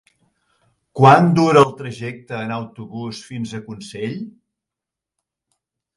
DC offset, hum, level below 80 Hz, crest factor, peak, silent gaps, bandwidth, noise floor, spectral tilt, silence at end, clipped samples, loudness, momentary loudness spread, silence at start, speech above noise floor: under 0.1%; none; -60 dBFS; 20 dB; 0 dBFS; none; 11.5 kHz; -86 dBFS; -7 dB/octave; 1.65 s; under 0.1%; -16 LUFS; 20 LU; 0.95 s; 69 dB